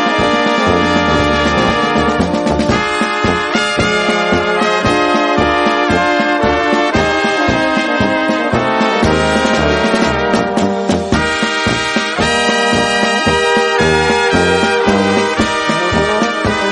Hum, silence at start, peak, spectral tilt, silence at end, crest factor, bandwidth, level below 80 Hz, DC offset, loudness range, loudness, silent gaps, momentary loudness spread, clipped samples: none; 0 s; 0 dBFS; -4.5 dB/octave; 0 s; 12 dB; 11 kHz; -32 dBFS; under 0.1%; 1 LU; -13 LUFS; none; 2 LU; under 0.1%